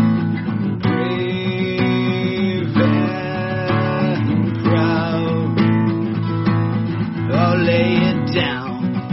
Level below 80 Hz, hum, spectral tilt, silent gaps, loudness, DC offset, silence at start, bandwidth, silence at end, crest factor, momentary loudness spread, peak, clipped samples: -48 dBFS; none; -6 dB/octave; none; -18 LUFS; under 0.1%; 0 s; 6 kHz; 0 s; 14 dB; 6 LU; -4 dBFS; under 0.1%